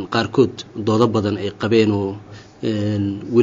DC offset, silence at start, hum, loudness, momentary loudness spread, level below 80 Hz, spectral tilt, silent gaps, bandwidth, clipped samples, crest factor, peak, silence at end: under 0.1%; 0 s; none; -19 LUFS; 9 LU; -56 dBFS; -6 dB/octave; none; 7.6 kHz; under 0.1%; 18 dB; -2 dBFS; 0 s